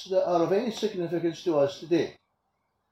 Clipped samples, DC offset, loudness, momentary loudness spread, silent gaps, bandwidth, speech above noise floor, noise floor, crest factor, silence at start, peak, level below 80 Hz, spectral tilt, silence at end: under 0.1%; under 0.1%; -27 LUFS; 6 LU; none; 13 kHz; 50 dB; -77 dBFS; 16 dB; 0 s; -12 dBFS; -70 dBFS; -6 dB/octave; 0.8 s